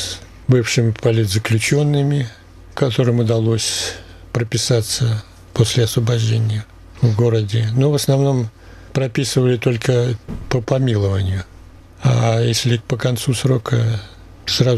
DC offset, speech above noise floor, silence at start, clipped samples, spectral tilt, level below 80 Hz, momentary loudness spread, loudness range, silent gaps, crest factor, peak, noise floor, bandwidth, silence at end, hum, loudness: under 0.1%; 24 dB; 0 s; under 0.1%; -5.5 dB/octave; -44 dBFS; 10 LU; 2 LU; none; 16 dB; -2 dBFS; -40 dBFS; 14 kHz; 0 s; none; -18 LUFS